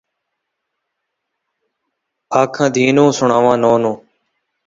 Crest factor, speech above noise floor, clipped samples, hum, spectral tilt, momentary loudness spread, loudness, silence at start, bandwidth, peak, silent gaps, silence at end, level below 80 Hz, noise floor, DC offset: 18 dB; 63 dB; under 0.1%; none; -5.5 dB/octave; 7 LU; -14 LUFS; 2.3 s; 7.8 kHz; 0 dBFS; none; 0.7 s; -58 dBFS; -76 dBFS; under 0.1%